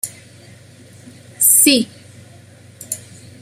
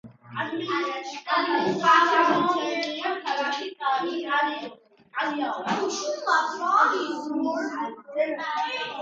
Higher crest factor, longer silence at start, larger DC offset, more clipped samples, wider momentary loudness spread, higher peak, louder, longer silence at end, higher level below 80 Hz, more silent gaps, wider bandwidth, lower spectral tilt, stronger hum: about the same, 20 dB vs 20 dB; about the same, 0.05 s vs 0.05 s; neither; neither; first, 19 LU vs 11 LU; first, 0 dBFS vs -4 dBFS; first, -11 LUFS vs -25 LUFS; first, 0.45 s vs 0 s; first, -64 dBFS vs -76 dBFS; neither; first, 16 kHz vs 7.8 kHz; second, -1 dB/octave vs -3.5 dB/octave; neither